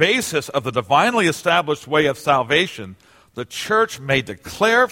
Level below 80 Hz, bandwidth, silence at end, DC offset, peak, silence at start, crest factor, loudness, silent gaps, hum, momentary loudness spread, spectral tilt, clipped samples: -54 dBFS; 16.5 kHz; 0 s; under 0.1%; -2 dBFS; 0 s; 18 dB; -18 LUFS; none; none; 15 LU; -4 dB/octave; under 0.1%